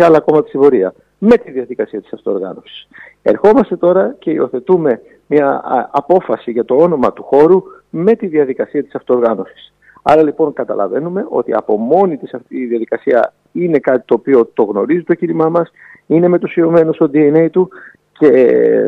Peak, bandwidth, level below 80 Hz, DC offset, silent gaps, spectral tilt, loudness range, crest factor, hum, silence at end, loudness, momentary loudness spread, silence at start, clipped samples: 0 dBFS; 6 kHz; -56 dBFS; under 0.1%; none; -9 dB/octave; 3 LU; 12 dB; none; 0 s; -13 LUFS; 10 LU; 0 s; under 0.1%